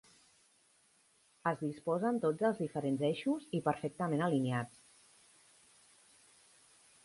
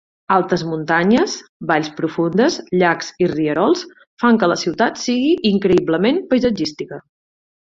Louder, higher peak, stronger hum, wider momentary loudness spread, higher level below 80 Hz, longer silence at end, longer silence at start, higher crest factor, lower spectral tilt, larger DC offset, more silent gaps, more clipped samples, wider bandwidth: second, -35 LUFS vs -17 LUFS; second, -18 dBFS vs -2 dBFS; neither; about the same, 6 LU vs 8 LU; second, -78 dBFS vs -52 dBFS; first, 2.35 s vs 0.75 s; first, 1.45 s vs 0.3 s; about the same, 20 dB vs 16 dB; first, -7 dB/octave vs -5.5 dB/octave; neither; second, none vs 1.49-1.60 s, 4.07-4.17 s; neither; first, 11.5 kHz vs 7.8 kHz